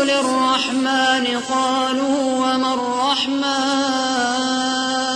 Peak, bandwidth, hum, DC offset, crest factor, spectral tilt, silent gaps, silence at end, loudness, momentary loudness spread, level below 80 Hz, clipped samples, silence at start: -6 dBFS; 10.5 kHz; none; under 0.1%; 14 dB; -1.5 dB/octave; none; 0 s; -18 LUFS; 2 LU; -60 dBFS; under 0.1%; 0 s